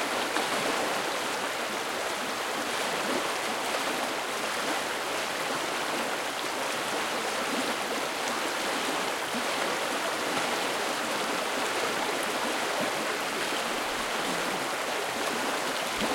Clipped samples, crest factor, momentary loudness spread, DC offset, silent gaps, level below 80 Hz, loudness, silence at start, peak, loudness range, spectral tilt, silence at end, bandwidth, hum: under 0.1%; 18 dB; 2 LU; under 0.1%; none; -66 dBFS; -29 LUFS; 0 s; -12 dBFS; 1 LU; -1.5 dB/octave; 0 s; 16.5 kHz; none